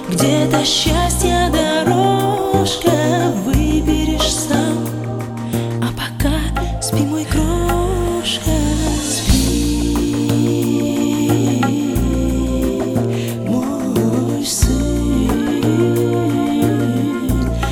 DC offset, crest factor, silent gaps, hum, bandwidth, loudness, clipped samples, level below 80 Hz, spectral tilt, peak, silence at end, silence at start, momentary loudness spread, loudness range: under 0.1%; 14 dB; none; none; 18.5 kHz; -17 LUFS; under 0.1%; -24 dBFS; -5 dB/octave; -2 dBFS; 0 s; 0 s; 5 LU; 3 LU